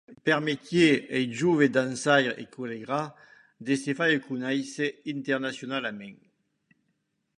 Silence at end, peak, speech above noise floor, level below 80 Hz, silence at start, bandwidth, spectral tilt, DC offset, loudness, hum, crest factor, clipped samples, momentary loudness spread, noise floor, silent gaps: 1.25 s; -6 dBFS; 50 dB; -70 dBFS; 0.1 s; 11 kHz; -5 dB/octave; under 0.1%; -27 LUFS; none; 22 dB; under 0.1%; 14 LU; -76 dBFS; none